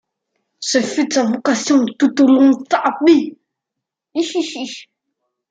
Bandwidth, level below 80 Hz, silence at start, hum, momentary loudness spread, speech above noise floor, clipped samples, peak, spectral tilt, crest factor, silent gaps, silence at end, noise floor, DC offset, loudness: 9.2 kHz; -66 dBFS; 0.6 s; none; 14 LU; 67 dB; under 0.1%; -2 dBFS; -3.5 dB/octave; 16 dB; none; 0.7 s; -82 dBFS; under 0.1%; -15 LUFS